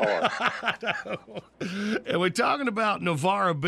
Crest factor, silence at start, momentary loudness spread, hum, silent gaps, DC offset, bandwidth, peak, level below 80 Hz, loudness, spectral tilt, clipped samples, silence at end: 16 dB; 0 s; 12 LU; none; none; under 0.1%; 14 kHz; -10 dBFS; -66 dBFS; -27 LUFS; -5 dB/octave; under 0.1%; 0 s